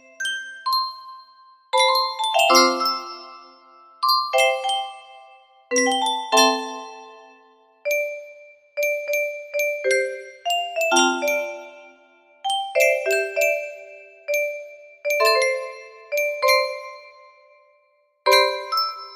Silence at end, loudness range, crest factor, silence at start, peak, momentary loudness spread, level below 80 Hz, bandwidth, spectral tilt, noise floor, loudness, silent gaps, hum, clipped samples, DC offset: 0 s; 4 LU; 22 dB; 0.2 s; -2 dBFS; 19 LU; -76 dBFS; 15.5 kHz; 0.5 dB/octave; -63 dBFS; -21 LUFS; none; none; under 0.1%; under 0.1%